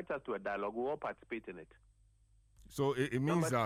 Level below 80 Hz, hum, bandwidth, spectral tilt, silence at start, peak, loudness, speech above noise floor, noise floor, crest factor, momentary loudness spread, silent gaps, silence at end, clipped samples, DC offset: -66 dBFS; none; 16 kHz; -6 dB/octave; 0 s; -20 dBFS; -37 LUFS; 32 dB; -68 dBFS; 18 dB; 14 LU; none; 0 s; under 0.1%; under 0.1%